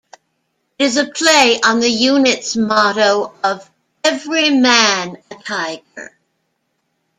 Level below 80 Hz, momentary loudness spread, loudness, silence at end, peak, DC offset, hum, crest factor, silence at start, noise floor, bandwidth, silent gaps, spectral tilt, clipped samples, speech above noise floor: -60 dBFS; 17 LU; -14 LUFS; 1.15 s; 0 dBFS; under 0.1%; none; 16 dB; 0.8 s; -69 dBFS; 15 kHz; none; -2 dB/octave; under 0.1%; 54 dB